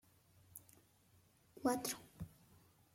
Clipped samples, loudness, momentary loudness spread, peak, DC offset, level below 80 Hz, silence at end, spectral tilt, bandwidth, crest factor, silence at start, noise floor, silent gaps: under 0.1%; -43 LUFS; 20 LU; -24 dBFS; under 0.1%; -72 dBFS; 0.7 s; -4 dB/octave; 16.5 kHz; 24 dB; 0.55 s; -71 dBFS; none